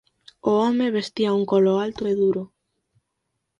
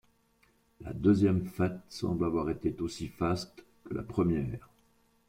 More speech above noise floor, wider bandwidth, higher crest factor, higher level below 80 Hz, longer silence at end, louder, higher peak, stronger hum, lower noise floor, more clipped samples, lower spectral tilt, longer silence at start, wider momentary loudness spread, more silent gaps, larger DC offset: first, 57 dB vs 38 dB; second, 9 kHz vs 16 kHz; about the same, 16 dB vs 18 dB; second, -62 dBFS vs -54 dBFS; first, 1.15 s vs 0.7 s; first, -22 LUFS vs -31 LUFS; first, -6 dBFS vs -14 dBFS; neither; first, -78 dBFS vs -69 dBFS; neither; about the same, -7 dB/octave vs -7.5 dB/octave; second, 0.45 s vs 0.8 s; second, 8 LU vs 14 LU; neither; neither